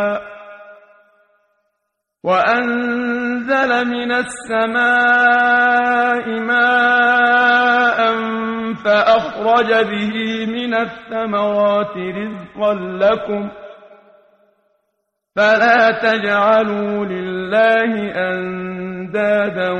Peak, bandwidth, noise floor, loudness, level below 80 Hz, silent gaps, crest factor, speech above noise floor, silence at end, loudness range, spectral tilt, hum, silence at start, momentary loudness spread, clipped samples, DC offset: -2 dBFS; 10.5 kHz; -74 dBFS; -16 LUFS; -56 dBFS; none; 16 dB; 59 dB; 0 s; 7 LU; -5 dB/octave; none; 0 s; 12 LU; under 0.1%; under 0.1%